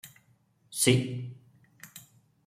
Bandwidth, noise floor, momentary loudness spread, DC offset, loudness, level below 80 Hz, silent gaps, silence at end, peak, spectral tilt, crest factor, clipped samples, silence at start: 16 kHz; -67 dBFS; 24 LU; under 0.1%; -27 LUFS; -68 dBFS; none; 0.45 s; -8 dBFS; -4 dB/octave; 24 dB; under 0.1%; 0.05 s